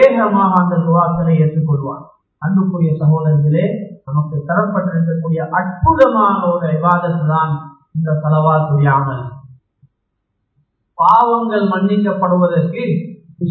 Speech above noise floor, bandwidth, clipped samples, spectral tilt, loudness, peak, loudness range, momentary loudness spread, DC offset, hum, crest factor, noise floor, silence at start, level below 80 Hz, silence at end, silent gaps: 57 dB; 4.4 kHz; under 0.1%; -10.5 dB/octave; -15 LUFS; 0 dBFS; 2 LU; 11 LU; under 0.1%; none; 14 dB; -71 dBFS; 0 s; -42 dBFS; 0 s; none